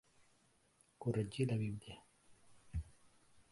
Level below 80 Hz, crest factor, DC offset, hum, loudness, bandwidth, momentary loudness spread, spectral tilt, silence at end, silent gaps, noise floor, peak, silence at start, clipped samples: -58 dBFS; 20 dB; under 0.1%; none; -42 LUFS; 11.5 kHz; 19 LU; -7 dB/octave; 0.1 s; none; -74 dBFS; -24 dBFS; 1 s; under 0.1%